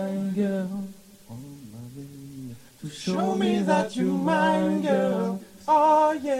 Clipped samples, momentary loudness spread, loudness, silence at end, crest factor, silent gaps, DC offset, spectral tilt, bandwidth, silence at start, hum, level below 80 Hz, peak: under 0.1%; 21 LU; -24 LUFS; 0 s; 16 dB; none; under 0.1%; -6.5 dB/octave; 15.5 kHz; 0 s; none; -64 dBFS; -8 dBFS